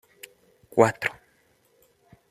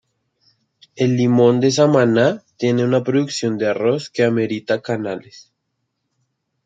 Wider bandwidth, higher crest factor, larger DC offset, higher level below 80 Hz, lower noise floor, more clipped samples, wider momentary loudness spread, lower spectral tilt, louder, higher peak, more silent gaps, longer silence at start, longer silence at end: first, 15.5 kHz vs 9.2 kHz; first, 26 dB vs 16 dB; neither; about the same, -68 dBFS vs -66 dBFS; second, -64 dBFS vs -74 dBFS; neither; first, 26 LU vs 9 LU; about the same, -5.5 dB/octave vs -6 dB/octave; second, -24 LUFS vs -17 LUFS; about the same, -2 dBFS vs -2 dBFS; neither; second, 0.75 s vs 0.95 s; about the same, 1.2 s vs 1.25 s